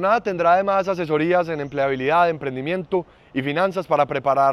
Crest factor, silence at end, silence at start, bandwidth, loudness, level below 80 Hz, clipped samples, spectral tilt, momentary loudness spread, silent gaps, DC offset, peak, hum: 14 dB; 0 s; 0 s; 12 kHz; -21 LUFS; -56 dBFS; under 0.1%; -7 dB/octave; 8 LU; none; under 0.1%; -6 dBFS; none